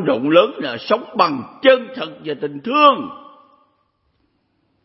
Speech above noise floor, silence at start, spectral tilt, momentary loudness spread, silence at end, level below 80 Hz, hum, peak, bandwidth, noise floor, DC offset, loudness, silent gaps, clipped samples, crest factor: 48 dB; 0 s; -7.5 dB/octave; 14 LU; 1.65 s; -68 dBFS; none; 0 dBFS; 5.8 kHz; -65 dBFS; under 0.1%; -17 LUFS; none; under 0.1%; 18 dB